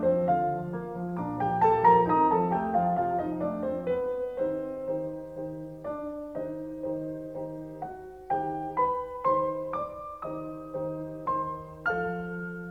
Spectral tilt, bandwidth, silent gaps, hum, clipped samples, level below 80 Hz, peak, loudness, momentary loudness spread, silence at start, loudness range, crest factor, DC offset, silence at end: -9 dB/octave; 6.8 kHz; none; none; under 0.1%; -58 dBFS; -10 dBFS; -29 LUFS; 14 LU; 0 s; 10 LU; 20 dB; under 0.1%; 0 s